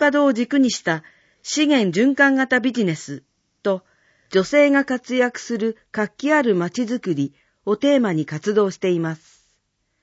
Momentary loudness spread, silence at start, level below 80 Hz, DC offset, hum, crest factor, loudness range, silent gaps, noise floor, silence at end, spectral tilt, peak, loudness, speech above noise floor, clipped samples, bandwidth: 12 LU; 0 s; -68 dBFS; under 0.1%; none; 16 dB; 3 LU; none; -70 dBFS; 0.85 s; -5 dB/octave; -4 dBFS; -20 LUFS; 51 dB; under 0.1%; 8 kHz